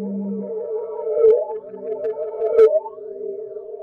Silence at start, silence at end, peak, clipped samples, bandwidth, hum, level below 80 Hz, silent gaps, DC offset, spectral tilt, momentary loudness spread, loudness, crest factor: 0 s; 0 s; -4 dBFS; under 0.1%; 4.1 kHz; none; -64 dBFS; none; under 0.1%; -9 dB/octave; 16 LU; -21 LUFS; 16 dB